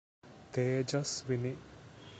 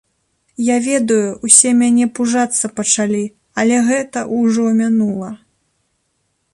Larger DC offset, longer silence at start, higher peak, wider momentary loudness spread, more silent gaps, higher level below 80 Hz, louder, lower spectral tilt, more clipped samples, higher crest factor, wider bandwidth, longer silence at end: neither; second, 0.25 s vs 0.6 s; second, -20 dBFS vs 0 dBFS; first, 18 LU vs 12 LU; neither; second, -66 dBFS vs -60 dBFS; second, -35 LUFS vs -14 LUFS; first, -5 dB/octave vs -3.5 dB/octave; neither; about the same, 18 dB vs 16 dB; second, 9 kHz vs 11.5 kHz; second, 0 s vs 1.2 s